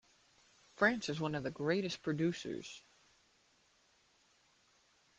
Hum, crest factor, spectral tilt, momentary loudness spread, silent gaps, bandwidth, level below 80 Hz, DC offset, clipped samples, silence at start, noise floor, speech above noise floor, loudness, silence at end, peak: none; 24 dB; -5.5 dB/octave; 13 LU; none; 9.8 kHz; -74 dBFS; under 0.1%; under 0.1%; 0.8 s; -72 dBFS; 36 dB; -36 LUFS; 2.4 s; -16 dBFS